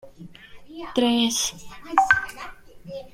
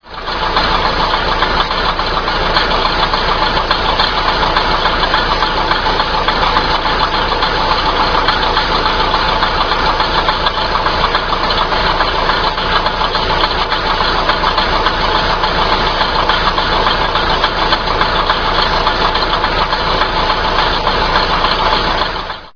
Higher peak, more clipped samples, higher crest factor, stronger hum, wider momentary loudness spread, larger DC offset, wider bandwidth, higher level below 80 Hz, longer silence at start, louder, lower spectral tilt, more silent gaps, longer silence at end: about the same, -2 dBFS vs 0 dBFS; neither; first, 24 dB vs 14 dB; neither; first, 21 LU vs 2 LU; neither; first, 16.5 kHz vs 5.4 kHz; second, -52 dBFS vs -24 dBFS; about the same, 0.05 s vs 0.05 s; second, -22 LUFS vs -13 LUFS; second, -2 dB/octave vs -4.5 dB/octave; neither; about the same, 0.05 s vs 0.05 s